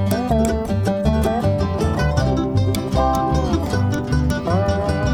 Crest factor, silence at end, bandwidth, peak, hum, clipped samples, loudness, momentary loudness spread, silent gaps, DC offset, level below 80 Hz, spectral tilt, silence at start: 14 dB; 0 s; 17 kHz; -4 dBFS; none; under 0.1%; -19 LUFS; 2 LU; none; under 0.1%; -26 dBFS; -7 dB/octave; 0 s